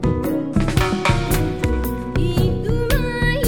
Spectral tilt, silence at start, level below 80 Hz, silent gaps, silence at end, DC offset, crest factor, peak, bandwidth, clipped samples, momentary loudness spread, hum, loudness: -6 dB/octave; 0 s; -26 dBFS; none; 0 s; 0.8%; 14 dB; -4 dBFS; over 20 kHz; under 0.1%; 3 LU; none; -20 LUFS